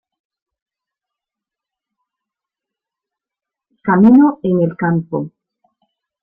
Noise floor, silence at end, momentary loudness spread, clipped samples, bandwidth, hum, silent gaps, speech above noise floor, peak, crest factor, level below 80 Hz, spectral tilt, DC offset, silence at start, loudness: -86 dBFS; 0.95 s; 16 LU; under 0.1%; 3.4 kHz; none; none; 74 dB; -2 dBFS; 16 dB; -58 dBFS; -11.5 dB/octave; under 0.1%; 3.85 s; -14 LUFS